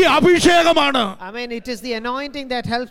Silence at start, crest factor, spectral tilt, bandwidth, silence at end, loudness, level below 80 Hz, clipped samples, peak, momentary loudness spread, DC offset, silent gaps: 0 s; 16 dB; -4 dB/octave; 16 kHz; 0.05 s; -17 LUFS; -44 dBFS; under 0.1%; -2 dBFS; 15 LU; under 0.1%; none